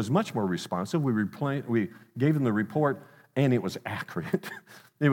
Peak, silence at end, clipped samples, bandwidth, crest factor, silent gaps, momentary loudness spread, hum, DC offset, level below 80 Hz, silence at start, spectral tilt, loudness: -10 dBFS; 0 s; under 0.1%; 17 kHz; 18 dB; none; 9 LU; none; under 0.1%; -74 dBFS; 0 s; -7 dB/octave; -29 LUFS